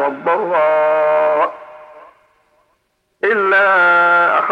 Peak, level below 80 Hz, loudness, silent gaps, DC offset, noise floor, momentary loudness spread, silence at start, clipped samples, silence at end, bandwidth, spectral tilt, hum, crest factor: -4 dBFS; -72 dBFS; -13 LUFS; none; under 0.1%; -65 dBFS; 7 LU; 0 s; under 0.1%; 0 s; 6 kHz; -5.5 dB/octave; none; 12 dB